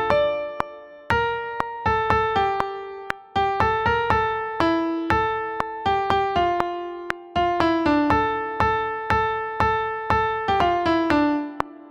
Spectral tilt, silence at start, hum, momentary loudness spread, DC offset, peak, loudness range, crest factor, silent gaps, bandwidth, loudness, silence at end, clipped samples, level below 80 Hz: -6.5 dB/octave; 0 s; none; 9 LU; under 0.1%; -2 dBFS; 2 LU; 22 dB; none; 11.5 kHz; -23 LUFS; 0 s; under 0.1%; -42 dBFS